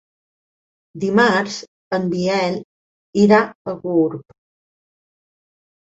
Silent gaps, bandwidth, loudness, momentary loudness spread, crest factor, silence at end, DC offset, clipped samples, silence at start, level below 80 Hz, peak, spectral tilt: 1.68-1.91 s, 2.64-3.13 s, 3.55-3.65 s; 8 kHz; -18 LUFS; 14 LU; 20 dB; 1.7 s; under 0.1%; under 0.1%; 0.95 s; -62 dBFS; -2 dBFS; -6 dB/octave